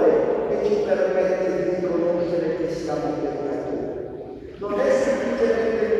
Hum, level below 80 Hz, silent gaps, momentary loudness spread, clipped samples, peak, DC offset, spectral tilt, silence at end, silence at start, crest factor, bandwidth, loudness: none; -52 dBFS; none; 9 LU; under 0.1%; -8 dBFS; under 0.1%; -6.5 dB/octave; 0 s; 0 s; 14 dB; 9.8 kHz; -23 LUFS